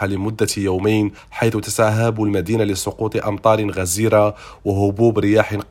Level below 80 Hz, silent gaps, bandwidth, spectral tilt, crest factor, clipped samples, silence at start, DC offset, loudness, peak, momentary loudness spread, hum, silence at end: -46 dBFS; none; 16.5 kHz; -5.5 dB/octave; 16 dB; under 0.1%; 0 s; under 0.1%; -18 LUFS; 0 dBFS; 6 LU; none; 0.1 s